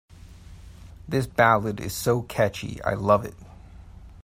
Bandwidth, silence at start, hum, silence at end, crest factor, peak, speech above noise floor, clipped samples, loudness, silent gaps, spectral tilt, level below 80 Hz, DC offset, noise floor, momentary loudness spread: 16 kHz; 0.1 s; none; 0 s; 22 dB; -4 dBFS; 22 dB; under 0.1%; -24 LUFS; none; -5.5 dB/octave; -48 dBFS; under 0.1%; -45 dBFS; 10 LU